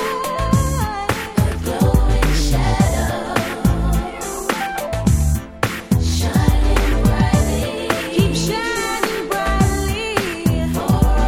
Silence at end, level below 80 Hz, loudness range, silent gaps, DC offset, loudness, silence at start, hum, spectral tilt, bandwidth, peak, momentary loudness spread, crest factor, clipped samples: 0 s; -22 dBFS; 2 LU; none; under 0.1%; -19 LUFS; 0 s; none; -5.5 dB/octave; 17 kHz; 0 dBFS; 5 LU; 16 dB; under 0.1%